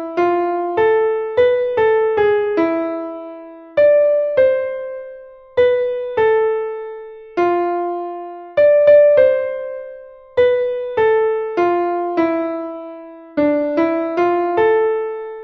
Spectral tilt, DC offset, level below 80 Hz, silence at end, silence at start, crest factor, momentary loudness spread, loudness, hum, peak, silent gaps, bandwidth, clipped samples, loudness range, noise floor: -7 dB/octave; under 0.1%; -56 dBFS; 0 s; 0 s; 16 dB; 16 LU; -16 LUFS; none; -2 dBFS; none; 6 kHz; under 0.1%; 4 LU; -37 dBFS